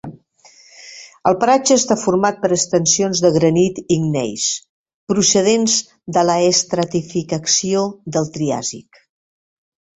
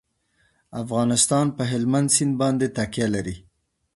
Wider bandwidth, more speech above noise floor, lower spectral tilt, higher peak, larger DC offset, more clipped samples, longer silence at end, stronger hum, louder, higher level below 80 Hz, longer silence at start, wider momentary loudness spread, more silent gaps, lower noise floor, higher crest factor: second, 8.4 kHz vs 11.5 kHz; second, 33 dB vs 45 dB; about the same, -3.5 dB/octave vs -4.5 dB/octave; about the same, -2 dBFS vs -4 dBFS; neither; neither; first, 1.2 s vs 0.55 s; neither; first, -16 LUFS vs -22 LUFS; about the same, -54 dBFS vs -52 dBFS; second, 0.05 s vs 0.75 s; second, 9 LU vs 15 LU; first, 4.69-4.86 s, 4.94-5.07 s vs none; second, -49 dBFS vs -66 dBFS; about the same, 16 dB vs 20 dB